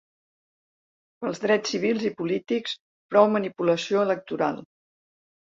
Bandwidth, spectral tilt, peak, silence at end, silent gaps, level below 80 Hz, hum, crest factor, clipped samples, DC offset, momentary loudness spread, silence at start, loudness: 7.8 kHz; -5 dB/octave; -4 dBFS; 0.85 s; 2.80-3.09 s; -72 dBFS; none; 22 dB; under 0.1%; under 0.1%; 13 LU; 1.2 s; -25 LUFS